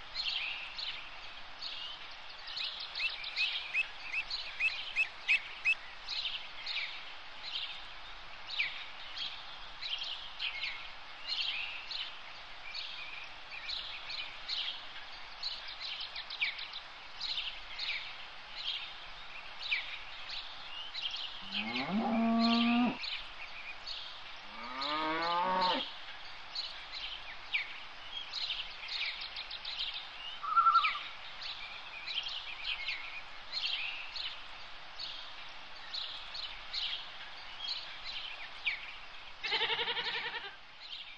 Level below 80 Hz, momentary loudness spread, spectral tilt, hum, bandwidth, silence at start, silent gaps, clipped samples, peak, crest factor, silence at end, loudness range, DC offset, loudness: -62 dBFS; 14 LU; -3 dB/octave; none; 9.4 kHz; 0 s; none; under 0.1%; -18 dBFS; 22 dB; 0 s; 6 LU; 0.3%; -36 LUFS